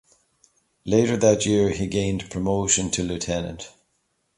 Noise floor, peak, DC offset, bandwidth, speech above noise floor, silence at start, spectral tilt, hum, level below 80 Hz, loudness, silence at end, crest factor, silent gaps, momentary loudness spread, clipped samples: -71 dBFS; -4 dBFS; under 0.1%; 11.5 kHz; 49 dB; 0.85 s; -4.5 dB/octave; none; -46 dBFS; -22 LUFS; 0.7 s; 20 dB; none; 15 LU; under 0.1%